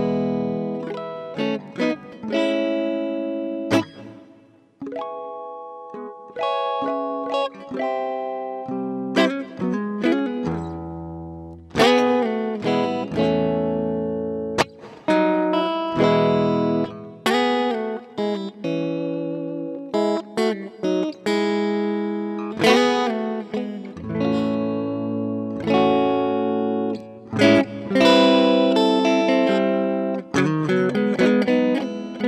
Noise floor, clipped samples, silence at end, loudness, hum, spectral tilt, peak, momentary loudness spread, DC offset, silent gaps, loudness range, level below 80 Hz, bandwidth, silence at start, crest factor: -52 dBFS; under 0.1%; 0 s; -22 LUFS; none; -6 dB/octave; -2 dBFS; 13 LU; under 0.1%; none; 8 LU; -56 dBFS; 14.5 kHz; 0 s; 20 dB